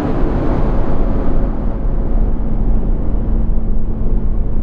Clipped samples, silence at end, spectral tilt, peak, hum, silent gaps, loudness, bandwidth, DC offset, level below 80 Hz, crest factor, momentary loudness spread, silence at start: under 0.1%; 0 s; -10.5 dB/octave; -2 dBFS; none; none; -20 LUFS; 3.1 kHz; under 0.1%; -14 dBFS; 12 dB; 3 LU; 0 s